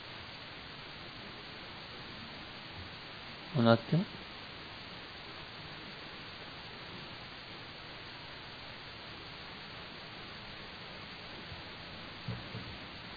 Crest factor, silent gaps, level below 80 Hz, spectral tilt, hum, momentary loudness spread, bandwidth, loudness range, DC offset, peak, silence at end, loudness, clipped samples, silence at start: 32 dB; none; -62 dBFS; -4 dB/octave; none; 10 LU; 5 kHz; 10 LU; under 0.1%; -10 dBFS; 0 s; -41 LUFS; under 0.1%; 0 s